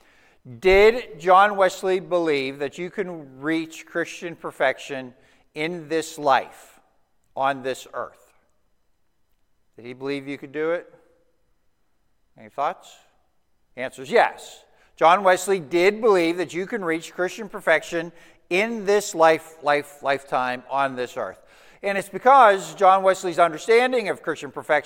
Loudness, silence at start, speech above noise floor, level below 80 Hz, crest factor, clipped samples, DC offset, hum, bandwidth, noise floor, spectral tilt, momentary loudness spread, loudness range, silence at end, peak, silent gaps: -21 LUFS; 0.45 s; 49 dB; -52 dBFS; 22 dB; under 0.1%; under 0.1%; none; 17 kHz; -70 dBFS; -4 dB/octave; 17 LU; 13 LU; 0.05 s; -2 dBFS; none